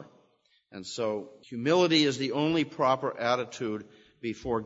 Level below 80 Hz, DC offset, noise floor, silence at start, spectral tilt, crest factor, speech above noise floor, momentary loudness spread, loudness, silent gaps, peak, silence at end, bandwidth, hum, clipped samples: -62 dBFS; under 0.1%; -68 dBFS; 0 s; -5 dB/octave; 18 dB; 40 dB; 16 LU; -28 LUFS; none; -12 dBFS; 0 s; 8 kHz; none; under 0.1%